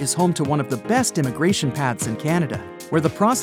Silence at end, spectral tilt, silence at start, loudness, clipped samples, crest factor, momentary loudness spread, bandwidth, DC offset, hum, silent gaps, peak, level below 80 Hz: 0 s; -5 dB/octave; 0 s; -21 LUFS; under 0.1%; 16 dB; 5 LU; 17.5 kHz; under 0.1%; none; none; -6 dBFS; -54 dBFS